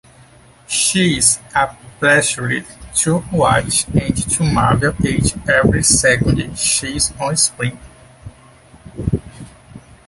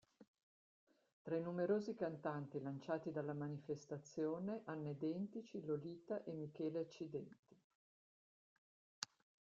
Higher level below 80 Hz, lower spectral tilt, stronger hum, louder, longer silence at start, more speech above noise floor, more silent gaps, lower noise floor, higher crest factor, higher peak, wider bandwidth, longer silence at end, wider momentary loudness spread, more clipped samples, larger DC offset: first, -34 dBFS vs -88 dBFS; second, -3.5 dB/octave vs -6.5 dB/octave; neither; first, -15 LUFS vs -46 LUFS; first, 0.7 s vs 0.2 s; second, 30 dB vs over 45 dB; second, none vs 0.27-0.34 s, 0.43-0.87 s, 1.13-1.25 s, 7.39-7.43 s, 7.64-9.02 s; second, -45 dBFS vs under -90 dBFS; second, 18 dB vs 26 dB; first, 0 dBFS vs -20 dBFS; first, 12 kHz vs 7.6 kHz; second, 0.3 s vs 0.45 s; about the same, 10 LU vs 10 LU; neither; neither